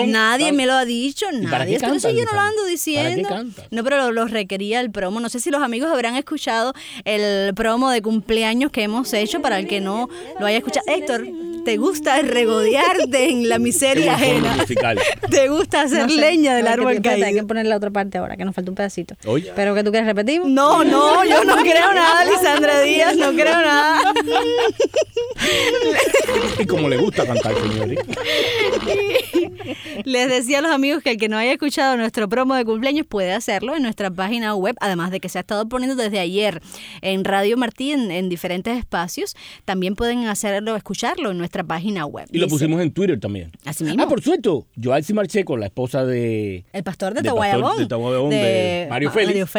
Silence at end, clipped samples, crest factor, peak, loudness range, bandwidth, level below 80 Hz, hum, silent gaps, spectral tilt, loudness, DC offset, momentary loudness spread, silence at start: 0 s; under 0.1%; 18 dB; 0 dBFS; 8 LU; over 20 kHz; -48 dBFS; none; none; -4 dB/octave; -18 LUFS; under 0.1%; 10 LU; 0 s